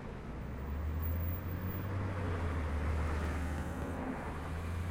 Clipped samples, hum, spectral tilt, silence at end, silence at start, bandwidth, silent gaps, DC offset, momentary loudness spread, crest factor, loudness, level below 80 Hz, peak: under 0.1%; none; -7.5 dB/octave; 0 s; 0 s; 16 kHz; none; under 0.1%; 5 LU; 12 dB; -39 LUFS; -44 dBFS; -26 dBFS